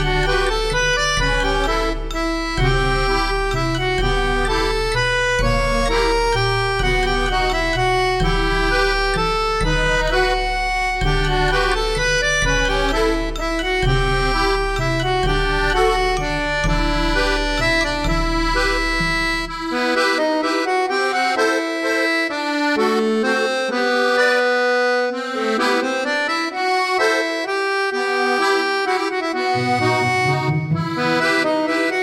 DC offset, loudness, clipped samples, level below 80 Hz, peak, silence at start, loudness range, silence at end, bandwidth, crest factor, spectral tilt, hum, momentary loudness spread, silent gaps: under 0.1%; -18 LUFS; under 0.1%; -26 dBFS; -6 dBFS; 0 s; 1 LU; 0 s; 14 kHz; 12 dB; -4.5 dB/octave; none; 3 LU; none